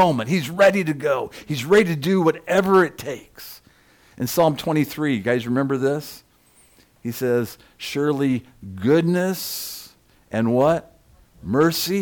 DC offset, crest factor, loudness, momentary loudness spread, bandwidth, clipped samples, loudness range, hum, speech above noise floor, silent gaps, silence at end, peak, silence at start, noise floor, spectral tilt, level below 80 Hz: under 0.1%; 14 dB; -21 LUFS; 16 LU; 19 kHz; under 0.1%; 5 LU; none; 36 dB; none; 0 s; -8 dBFS; 0 s; -56 dBFS; -5.5 dB/octave; -56 dBFS